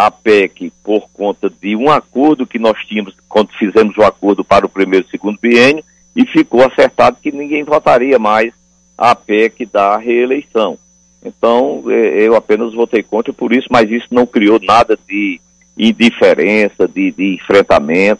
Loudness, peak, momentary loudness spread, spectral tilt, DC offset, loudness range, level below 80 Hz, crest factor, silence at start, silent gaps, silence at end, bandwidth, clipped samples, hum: -12 LUFS; 0 dBFS; 9 LU; -5.5 dB/octave; under 0.1%; 3 LU; -46 dBFS; 12 dB; 0 s; none; 0.05 s; 10.5 kHz; under 0.1%; none